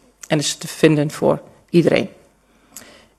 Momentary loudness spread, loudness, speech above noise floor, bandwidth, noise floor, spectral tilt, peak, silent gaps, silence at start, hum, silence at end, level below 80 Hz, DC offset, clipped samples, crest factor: 7 LU; -18 LUFS; 38 dB; 13.5 kHz; -55 dBFS; -5 dB/octave; 0 dBFS; none; 0.3 s; none; 0.4 s; -56 dBFS; under 0.1%; under 0.1%; 20 dB